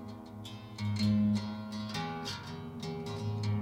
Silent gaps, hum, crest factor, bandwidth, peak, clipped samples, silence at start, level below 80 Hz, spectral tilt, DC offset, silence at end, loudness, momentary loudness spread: none; none; 14 dB; 16 kHz; -20 dBFS; under 0.1%; 0 s; -62 dBFS; -6.5 dB/octave; under 0.1%; 0 s; -35 LUFS; 16 LU